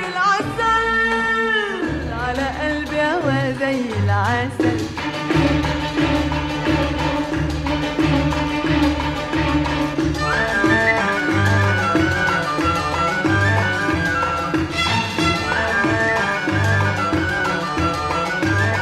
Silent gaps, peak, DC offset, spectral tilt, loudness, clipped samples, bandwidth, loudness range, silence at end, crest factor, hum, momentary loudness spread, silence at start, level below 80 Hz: none; -4 dBFS; under 0.1%; -5.5 dB/octave; -19 LUFS; under 0.1%; 13.5 kHz; 3 LU; 0 s; 14 dB; none; 5 LU; 0 s; -34 dBFS